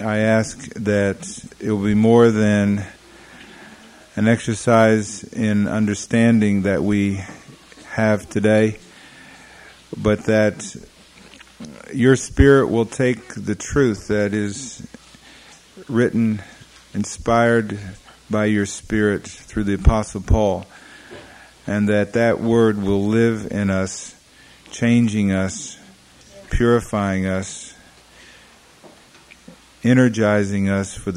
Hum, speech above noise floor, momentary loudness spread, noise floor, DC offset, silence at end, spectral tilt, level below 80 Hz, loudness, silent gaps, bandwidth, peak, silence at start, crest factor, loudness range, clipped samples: none; 30 dB; 18 LU; -48 dBFS; under 0.1%; 0 s; -6 dB/octave; -34 dBFS; -19 LUFS; none; 11.5 kHz; 0 dBFS; 0 s; 20 dB; 5 LU; under 0.1%